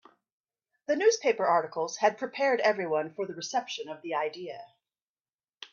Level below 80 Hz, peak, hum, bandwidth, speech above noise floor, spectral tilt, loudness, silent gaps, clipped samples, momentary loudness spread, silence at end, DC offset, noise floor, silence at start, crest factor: -80 dBFS; -12 dBFS; none; 7.4 kHz; over 61 dB; -3 dB/octave; -29 LUFS; 5.02-5.16 s, 5.33-5.39 s; under 0.1%; 16 LU; 0.05 s; under 0.1%; under -90 dBFS; 0.9 s; 20 dB